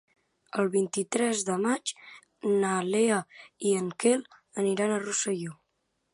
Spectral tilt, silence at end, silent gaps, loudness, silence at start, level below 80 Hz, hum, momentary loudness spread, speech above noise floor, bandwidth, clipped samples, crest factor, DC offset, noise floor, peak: -4 dB/octave; 0.6 s; none; -28 LUFS; 0.55 s; -80 dBFS; none; 10 LU; 50 dB; 11.5 kHz; under 0.1%; 18 dB; under 0.1%; -77 dBFS; -12 dBFS